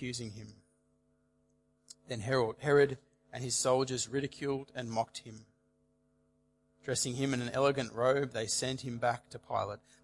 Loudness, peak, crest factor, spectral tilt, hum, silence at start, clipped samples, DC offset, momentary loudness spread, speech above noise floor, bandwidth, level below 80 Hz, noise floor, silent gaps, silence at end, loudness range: -33 LUFS; -16 dBFS; 20 dB; -4 dB/octave; none; 0 s; under 0.1%; under 0.1%; 14 LU; 40 dB; 11.5 kHz; -70 dBFS; -73 dBFS; none; 0.25 s; 5 LU